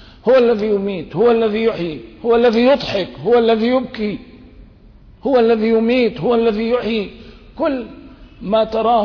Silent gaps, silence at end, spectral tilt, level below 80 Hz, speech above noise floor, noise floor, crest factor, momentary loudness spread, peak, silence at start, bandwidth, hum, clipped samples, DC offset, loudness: none; 0 s; -7 dB/octave; -44 dBFS; 28 dB; -44 dBFS; 12 dB; 11 LU; -4 dBFS; 0.25 s; 5.4 kHz; none; under 0.1%; under 0.1%; -16 LUFS